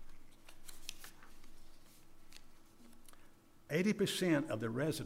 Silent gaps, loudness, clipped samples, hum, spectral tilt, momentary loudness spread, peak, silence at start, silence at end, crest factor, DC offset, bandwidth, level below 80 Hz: none; -37 LUFS; under 0.1%; none; -5 dB/octave; 26 LU; -22 dBFS; 0 s; 0 s; 20 dB; under 0.1%; 16 kHz; -58 dBFS